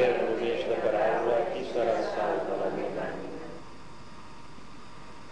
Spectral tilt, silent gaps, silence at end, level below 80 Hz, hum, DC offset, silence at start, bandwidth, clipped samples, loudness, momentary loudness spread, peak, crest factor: -5.5 dB/octave; none; 0 s; -58 dBFS; none; 0.8%; 0 s; 10.5 kHz; under 0.1%; -29 LUFS; 22 LU; -14 dBFS; 18 dB